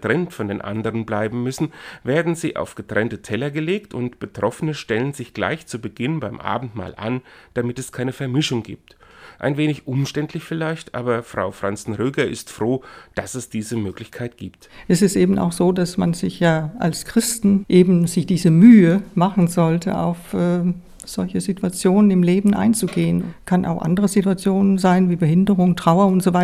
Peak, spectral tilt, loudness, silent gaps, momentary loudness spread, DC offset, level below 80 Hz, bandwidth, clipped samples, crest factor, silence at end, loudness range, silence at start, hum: 0 dBFS; -6.5 dB/octave; -19 LUFS; none; 12 LU; under 0.1%; -50 dBFS; 15.5 kHz; under 0.1%; 18 dB; 0 s; 10 LU; 0 s; none